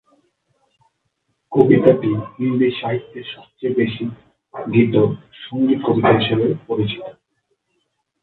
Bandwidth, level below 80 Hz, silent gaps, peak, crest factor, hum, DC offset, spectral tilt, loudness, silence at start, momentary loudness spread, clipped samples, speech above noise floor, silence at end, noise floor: 4.4 kHz; -56 dBFS; none; 0 dBFS; 20 dB; none; under 0.1%; -10 dB/octave; -18 LUFS; 1.5 s; 18 LU; under 0.1%; 53 dB; 1.1 s; -71 dBFS